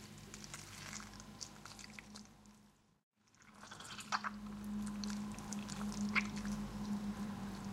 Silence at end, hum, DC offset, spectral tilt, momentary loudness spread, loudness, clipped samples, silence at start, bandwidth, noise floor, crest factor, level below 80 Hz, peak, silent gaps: 0 s; none; under 0.1%; -4 dB/octave; 17 LU; -44 LUFS; under 0.1%; 0 s; 16 kHz; -68 dBFS; 24 dB; -62 dBFS; -20 dBFS; 3.03-3.11 s